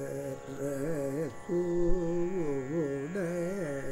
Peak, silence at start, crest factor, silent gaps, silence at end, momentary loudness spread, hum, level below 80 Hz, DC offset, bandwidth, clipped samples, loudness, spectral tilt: -14 dBFS; 0 s; 18 dB; none; 0 s; 7 LU; none; -42 dBFS; under 0.1%; 15.5 kHz; under 0.1%; -34 LUFS; -7.5 dB/octave